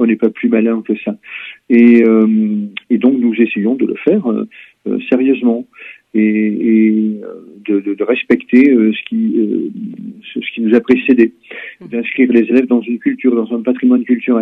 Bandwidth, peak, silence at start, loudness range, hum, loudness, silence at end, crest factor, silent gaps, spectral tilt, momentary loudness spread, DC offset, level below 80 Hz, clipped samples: 4 kHz; 0 dBFS; 0 s; 3 LU; none; -13 LUFS; 0 s; 12 dB; none; -9 dB/octave; 16 LU; under 0.1%; -62 dBFS; 0.1%